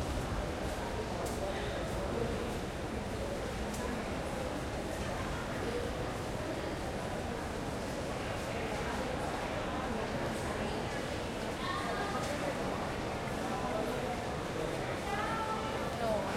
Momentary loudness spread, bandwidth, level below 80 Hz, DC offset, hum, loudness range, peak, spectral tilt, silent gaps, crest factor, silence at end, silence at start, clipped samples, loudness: 3 LU; 16.5 kHz; -46 dBFS; under 0.1%; none; 2 LU; -22 dBFS; -5 dB/octave; none; 14 dB; 0 s; 0 s; under 0.1%; -37 LUFS